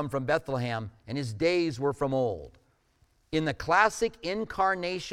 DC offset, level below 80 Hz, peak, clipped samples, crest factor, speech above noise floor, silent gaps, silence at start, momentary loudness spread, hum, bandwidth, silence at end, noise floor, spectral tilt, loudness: under 0.1%; -54 dBFS; -8 dBFS; under 0.1%; 22 dB; 39 dB; none; 0 s; 11 LU; none; 15 kHz; 0 s; -67 dBFS; -5.5 dB/octave; -29 LUFS